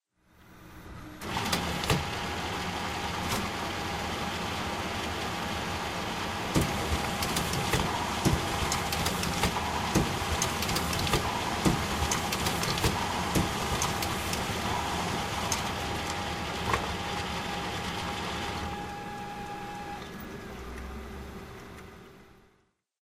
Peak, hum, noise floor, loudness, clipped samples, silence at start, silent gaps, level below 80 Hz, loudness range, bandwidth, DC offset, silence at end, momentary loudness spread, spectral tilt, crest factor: -10 dBFS; none; -70 dBFS; -31 LUFS; under 0.1%; 0.4 s; none; -44 dBFS; 8 LU; 16 kHz; under 0.1%; 0.7 s; 13 LU; -3.5 dB/octave; 22 dB